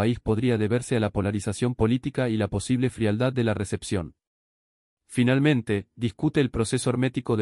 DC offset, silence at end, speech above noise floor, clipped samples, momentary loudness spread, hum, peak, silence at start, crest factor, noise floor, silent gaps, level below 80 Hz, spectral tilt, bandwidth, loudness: under 0.1%; 0 s; over 66 dB; under 0.1%; 7 LU; none; -8 dBFS; 0 s; 16 dB; under -90 dBFS; 4.27-4.97 s; -48 dBFS; -6.5 dB/octave; 12 kHz; -25 LUFS